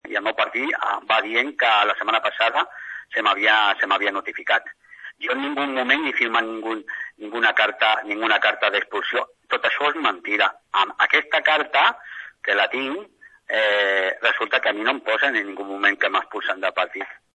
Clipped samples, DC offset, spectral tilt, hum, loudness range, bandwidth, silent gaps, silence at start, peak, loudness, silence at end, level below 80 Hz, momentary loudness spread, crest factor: under 0.1%; under 0.1%; -2 dB/octave; none; 2 LU; 9 kHz; none; 0.05 s; -4 dBFS; -20 LUFS; 0.2 s; -76 dBFS; 11 LU; 18 dB